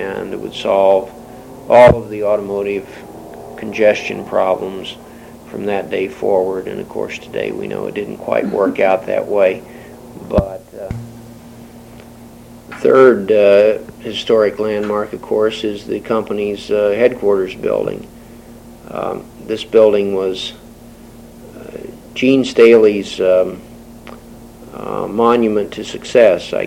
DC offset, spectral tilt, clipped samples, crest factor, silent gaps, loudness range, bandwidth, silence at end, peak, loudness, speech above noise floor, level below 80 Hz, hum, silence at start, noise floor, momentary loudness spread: under 0.1%; -6 dB/octave; under 0.1%; 16 dB; none; 6 LU; 16.5 kHz; 0 s; 0 dBFS; -15 LUFS; 23 dB; -42 dBFS; none; 0 s; -38 dBFS; 23 LU